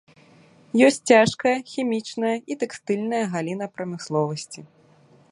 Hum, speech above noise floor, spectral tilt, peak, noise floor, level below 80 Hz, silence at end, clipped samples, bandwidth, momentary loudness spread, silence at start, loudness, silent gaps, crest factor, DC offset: none; 33 dB; -5 dB/octave; -2 dBFS; -55 dBFS; -64 dBFS; 0.65 s; under 0.1%; 11.5 kHz; 14 LU; 0.75 s; -23 LUFS; none; 22 dB; under 0.1%